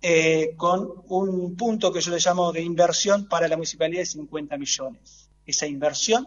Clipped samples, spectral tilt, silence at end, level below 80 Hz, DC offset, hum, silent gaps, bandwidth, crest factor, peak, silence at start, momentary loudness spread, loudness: under 0.1%; -3 dB/octave; 0 s; -60 dBFS; under 0.1%; none; none; 7.6 kHz; 18 dB; -6 dBFS; 0.05 s; 8 LU; -23 LUFS